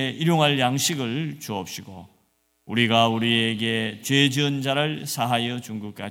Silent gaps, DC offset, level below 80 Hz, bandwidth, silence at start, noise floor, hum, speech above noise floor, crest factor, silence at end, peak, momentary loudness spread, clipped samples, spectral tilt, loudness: none; under 0.1%; -66 dBFS; 17 kHz; 0 s; -68 dBFS; none; 44 dB; 20 dB; 0 s; -4 dBFS; 13 LU; under 0.1%; -4 dB/octave; -22 LUFS